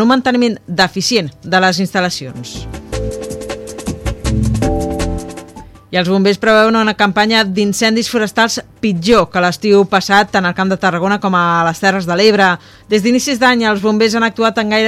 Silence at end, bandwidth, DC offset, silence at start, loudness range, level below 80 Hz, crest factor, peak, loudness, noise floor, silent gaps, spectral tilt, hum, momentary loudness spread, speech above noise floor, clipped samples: 0 s; 15.5 kHz; under 0.1%; 0 s; 7 LU; -32 dBFS; 14 dB; 0 dBFS; -13 LUFS; -35 dBFS; none; -4.5 dB/octave; none; 12 LU; 23 dB; under 0.1%